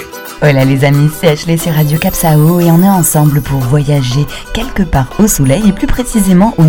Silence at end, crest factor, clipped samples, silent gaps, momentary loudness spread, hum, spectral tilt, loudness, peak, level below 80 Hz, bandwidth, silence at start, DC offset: 0 s; 10 dB; 2%; none; 7 LU; none; -6 dB/octave; -10 LUFS; 0 dBFS; -24 dBFS; 17.5 kHz; 0 s; under 0.1%